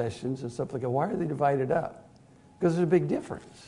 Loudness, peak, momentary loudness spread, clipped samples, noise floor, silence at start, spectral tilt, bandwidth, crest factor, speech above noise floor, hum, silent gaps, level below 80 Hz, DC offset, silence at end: -28 LUFS; -10 dBFS; 9 LU; under 0.1%; -56 dBFS; 0 s; -8 dB/octave; 11 kHz; 18 dB; 27 dB; none; none; -62 dBFS; under 0.1%; 0 s